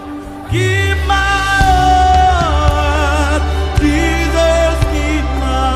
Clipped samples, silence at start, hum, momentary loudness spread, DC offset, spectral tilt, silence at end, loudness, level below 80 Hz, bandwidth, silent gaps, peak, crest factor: under 0.1%; 0 s; none; 6 LU; under 0.1%; -5 dB/octave; 0 s; -13 LUFS; -18 dBFS; 14 kHz; none; 0 dBFS; 12 dB